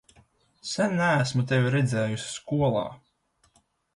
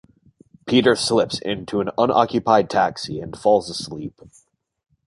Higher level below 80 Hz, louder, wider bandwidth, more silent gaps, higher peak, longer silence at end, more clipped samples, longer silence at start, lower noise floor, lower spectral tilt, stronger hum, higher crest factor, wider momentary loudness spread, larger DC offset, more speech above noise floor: about the same, -58 dBFS vs -54 dBFS; second, -26 LUFS vs -20 LUFS; about the same, 11.5 kHz vs 11.5 kHz; neither; second, -10 dBFS vs -2 dBFS; about the same, 1 s vs 0.95 s; neither; about the same, 0.65 s vs 0.65 s; first, -68 dBFS vs -54 dBFS; about the same, -5.5 dB/octave vs -4.5 dB/octave; neither; about the same, 16 dB vs 20 dB; second, 10 LU vs 13 LU; neither; first, 43 dB vs 34 dB